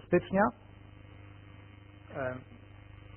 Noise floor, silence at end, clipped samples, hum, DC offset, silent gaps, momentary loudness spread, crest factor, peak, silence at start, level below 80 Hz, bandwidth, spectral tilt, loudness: -52 dBFS; 0.05 s; under 0.1%; none; under 0.1%; none; 24 LU; 24 dB; -12 dBFS; 0.1 s; -58 dBFS; 3.3 kHz; -3.5 dB/octave; -32 LUFS